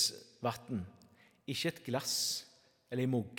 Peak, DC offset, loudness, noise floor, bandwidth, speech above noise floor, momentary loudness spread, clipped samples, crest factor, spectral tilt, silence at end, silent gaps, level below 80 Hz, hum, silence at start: -18 dBFS; under 0.1%; -37 LUFS; -64 dBFS; 18 kHz; 28 dB; 9 LU; under 0.1%; 20 dB; -3.5 dB/octave; 0 s; none; -78 dBFS; none; 0 s